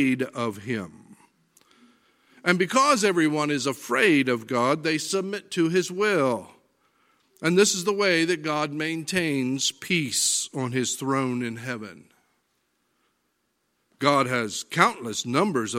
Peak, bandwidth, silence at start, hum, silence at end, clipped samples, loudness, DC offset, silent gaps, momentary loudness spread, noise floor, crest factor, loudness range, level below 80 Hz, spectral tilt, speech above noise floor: -2 dBFS; 16.5 kHz; 0 s; none; 0 s; under 0.1%; -24 LUFS; under 0.1%; none; 10 LU; -73 dBFS; 24 dB; 7 LU; -72 dBFS; -3.5 dB/octave; 49 dB